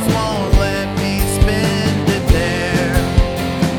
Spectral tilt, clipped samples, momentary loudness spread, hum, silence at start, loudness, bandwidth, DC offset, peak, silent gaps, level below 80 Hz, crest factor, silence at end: -5.5 dB/octave; under 0.1%; 3 LU; none; 0 s; -16 LUFS; 19 kHz; under 0.1%; -2 dBFS; none; -20 dBFS; 14 dB; 0 s